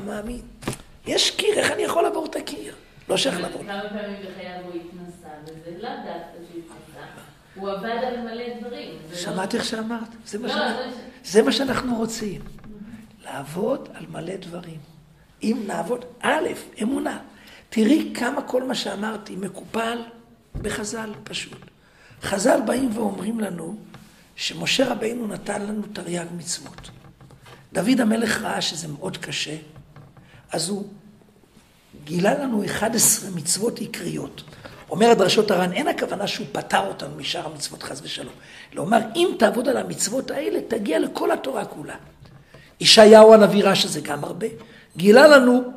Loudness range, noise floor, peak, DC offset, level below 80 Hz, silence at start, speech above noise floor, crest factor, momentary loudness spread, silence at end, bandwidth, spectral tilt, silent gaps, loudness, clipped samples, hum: 16 LU; -54 dBFS; 0 dBFS; under 0.1%; -54 dBFS; 0 s; 32 dB; 22 dB; 20 LU; 0 s; 15.5 kHz; -3.5 dB/octave; none; -21 LUFS; under 0.1%; none